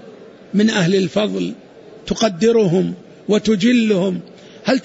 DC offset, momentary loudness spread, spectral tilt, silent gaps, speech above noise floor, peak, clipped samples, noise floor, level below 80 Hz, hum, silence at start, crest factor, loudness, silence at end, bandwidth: under 0.1%; 12 LU; -5.5 dB/octave; none; 24 dB; -4 dBFS; under 0.1%; -40 dBFS; -52 dBFS; none; 0 s; 14 dB; -17 LUFS; 0 s; 8 kHz